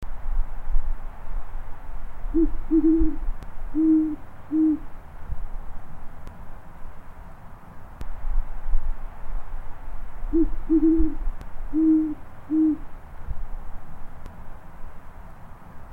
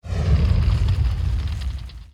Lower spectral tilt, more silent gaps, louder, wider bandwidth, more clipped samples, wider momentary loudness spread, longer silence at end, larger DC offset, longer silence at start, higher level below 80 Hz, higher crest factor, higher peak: first, -10 dB/octave vs -7.5 dB/octave; neither; second, -25 LUFS vs -22 LUFS; second, 2.6 kHz vs 9.8 kHz; neither; first, 25 LU vs 11 LU; about the same, 0 s vs 0.05 s; neither; about the same, 0 s vs 0.05 s; second, -28 dBFS vs -22 dBFS; about the same, 16 dB vs 14 dB; about the same, -8 dBFS vs -8 dBFS